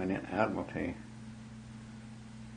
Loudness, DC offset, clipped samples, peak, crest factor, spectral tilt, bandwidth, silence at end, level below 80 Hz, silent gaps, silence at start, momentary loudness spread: -36 LUFS; under 0.1%; under 0.1%; -14 dBFS; 26 dB; -7 dB/octave; 10 kHz; 0 s; -60 dBFS; none; 0 s; 16 LU